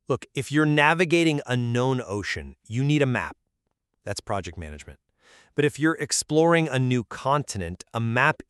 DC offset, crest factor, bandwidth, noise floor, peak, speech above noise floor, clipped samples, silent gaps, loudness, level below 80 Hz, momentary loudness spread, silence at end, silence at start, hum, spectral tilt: under 0.1%; 20 dB; 13 kHz; -78 dBFS; -4 dBFS; 54 dB; under 0.1%; none; -24 LUFS; -52 dBFS; 14 LU; 0.15 s; 0.1 s; none; -5 dB/octave